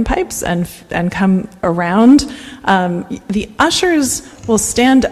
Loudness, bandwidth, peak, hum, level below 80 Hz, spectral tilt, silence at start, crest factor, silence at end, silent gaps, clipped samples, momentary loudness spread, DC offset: -14 LUFS; 14.5 kHz; 0 dBFS; none; -34 dBFS; -4.5 dB/octave; 0 s; 14 dB; 0 s; none; under 0.1%; 11 LU; under 0.1%